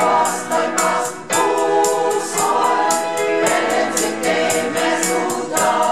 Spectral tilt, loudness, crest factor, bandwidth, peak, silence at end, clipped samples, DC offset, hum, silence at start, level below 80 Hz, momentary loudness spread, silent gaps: -2 dB/octave; -17 LUFS; 14 dB; 16 kHz; -2 dBFS; 0 s; under 0.1%; 0.6%; none; 0 s; -60 dBFS; 3 LU; none